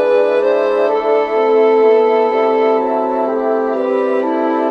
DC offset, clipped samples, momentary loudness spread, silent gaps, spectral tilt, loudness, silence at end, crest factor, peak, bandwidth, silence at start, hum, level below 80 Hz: under 0.1%; under 0.1%; 5 LU; none; -5.5 dB/octave; -14 LUFS; 0 s; 12 dB; -2 dBFS; 5.8 kHz; 0 s; none; -58 dBFS